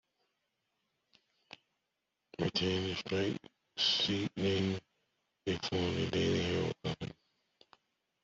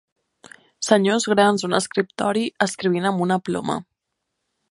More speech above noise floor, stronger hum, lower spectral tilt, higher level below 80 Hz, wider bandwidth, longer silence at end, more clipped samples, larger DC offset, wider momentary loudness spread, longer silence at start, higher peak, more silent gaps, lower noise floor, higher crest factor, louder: second, 52 dB vs 58 dB; neither; about the same, -5 dB/octave vs -4.5 dB/octave; about the same, -66 dBFS vs -66 dBFS; second, 7.8 kHz vs 11.5 kHz; first, 1.2 s vs 0.9 s; neither; neither; first, 13 LU vs 8 LU; first, 2.4 s vs 0.8 s; second, -18 dBFS vs 0 dBFS; neither; first, -86 dBFS vs -79 dBFS; about the same, 18 dB vs 22 dB; second, -34 LUFS vs -21 LUFS